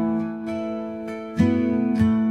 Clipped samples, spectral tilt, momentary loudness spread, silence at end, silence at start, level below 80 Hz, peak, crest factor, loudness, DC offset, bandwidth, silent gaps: under 0.1%; -8.5 dB/octave; 10 LU; 0 s; 0 s; -52 dBFS; -6 dBFS; 16 dB; -24 LUFS; under 0.1%; 8 kHz; none